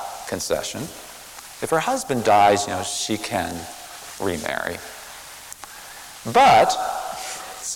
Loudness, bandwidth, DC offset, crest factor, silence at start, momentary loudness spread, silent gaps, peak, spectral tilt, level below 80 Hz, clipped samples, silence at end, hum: -21 LUFS; 18 kHz; under 0.1%; 18 dB; 0 s; 21 LU; none; -6 dBFS; -3 dB/octave; -54 dBFS; under 0.1%; 0 s; none